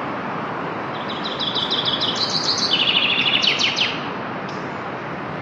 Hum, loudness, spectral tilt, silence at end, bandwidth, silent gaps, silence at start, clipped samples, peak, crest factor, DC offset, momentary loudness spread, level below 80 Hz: none; -20 LUFS; -2.5 dB/octave; 0 s; 11.5 kHz; none; 0 s; under 0.1%; -4 dBFS; 18 dB; under 0.1%; 12 LU; -60 dBFS